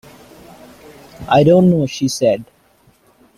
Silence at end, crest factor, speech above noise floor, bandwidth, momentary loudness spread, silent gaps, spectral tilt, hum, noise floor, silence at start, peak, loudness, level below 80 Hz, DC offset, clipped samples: 0.95 s; 16 dB; 40 dB; 14.5 kHz; 11 LU; none; -6.5 dB/octave; none; -54 dBFS; 1.2 s; -2 dBFS; -14 LUFS; -50 dBFS; under 0.1%; under 0.1%